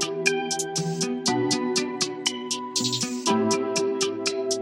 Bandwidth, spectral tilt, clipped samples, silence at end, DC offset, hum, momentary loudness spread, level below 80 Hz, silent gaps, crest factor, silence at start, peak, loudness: 16 kHz; -3 dB/octave; under 0.1%; 0 s; under 0.1%; none; 4 LU; -70 dBFS; none; 20 dB; 0 s; -6 dBFS; -25 LUFS